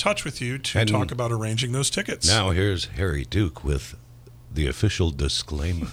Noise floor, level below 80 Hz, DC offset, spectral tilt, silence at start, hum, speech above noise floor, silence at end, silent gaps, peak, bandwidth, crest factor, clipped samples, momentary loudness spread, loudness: -44 dBFS; -34 dBFS; under 0.1%; -4 dB/octave; 0 s; none; 20 dB; 0 s; none; -6 dBFS; 15.5 kHz; 18 dB; under 0.1%; 9 LU; -24 LUFS